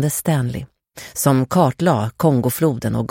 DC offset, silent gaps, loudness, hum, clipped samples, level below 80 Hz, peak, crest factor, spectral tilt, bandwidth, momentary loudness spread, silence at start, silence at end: under 0.1%; none; -18 LUFS; none; under 0.1%; -48 dBFS; -2 dBFS; 16 dB; -6 dB/octave; 17 kHz; 14 LU; 0 s; 0.05 s